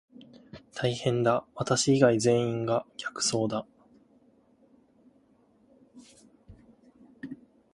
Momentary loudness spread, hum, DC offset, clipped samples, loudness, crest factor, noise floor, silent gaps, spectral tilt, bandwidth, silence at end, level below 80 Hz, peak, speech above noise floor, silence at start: 23 LU; none; under 0.1%; under 0.1%; -27 LUFS; 22 dB; -64 dBFS; none; -4.5 dB/octave; 11.5 kHz; 0.4 s; -64 dBFS; -8 dBFS; 37 dB; 0.55 s